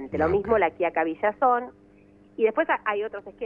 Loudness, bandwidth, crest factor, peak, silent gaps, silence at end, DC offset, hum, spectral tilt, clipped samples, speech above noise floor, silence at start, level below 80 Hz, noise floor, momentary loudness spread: -25 LUFS; 5 kHz; 16 dB; -8 dBFS; none; 0 s; under 0.1%; 50 Hz at -60 dBFS; -8.5 dB/octave; under 0.1%; 30 dB; 0 s; -52 dBFS; -54 dBFS; 9 LU